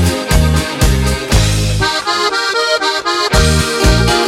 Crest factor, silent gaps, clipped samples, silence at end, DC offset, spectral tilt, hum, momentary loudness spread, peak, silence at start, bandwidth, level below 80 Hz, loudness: 12 dB; none; under 0.1%; 0 s; under 0.1%; -4 dB/octave; none; 3 LU; 0 dBFS; 0 s; 16.5 kHz; -18 dBFS; -13 LUFS